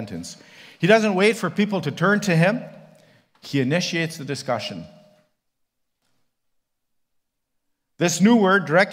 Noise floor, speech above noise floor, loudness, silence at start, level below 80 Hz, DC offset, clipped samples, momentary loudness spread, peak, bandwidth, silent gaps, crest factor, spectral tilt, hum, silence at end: -77 dBFS; 57 dB; -20 LUFS; 0 s; -68 dBFS; under 0.1%; under 0.1%; 16 LU; -2 dBFS; 16 kHz; none; 20 dB; -5 dB/octave; none; 0 s